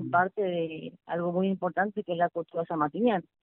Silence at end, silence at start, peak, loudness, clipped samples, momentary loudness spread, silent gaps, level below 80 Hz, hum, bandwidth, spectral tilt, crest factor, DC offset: 0.2 s; 0 s; -10 dBFS; -29 LUFS; under 0.1%; 7 LU; none; -72 dBFS; none; 4 kHz; -5.5 dB/octave; 18 dB; under 0.1%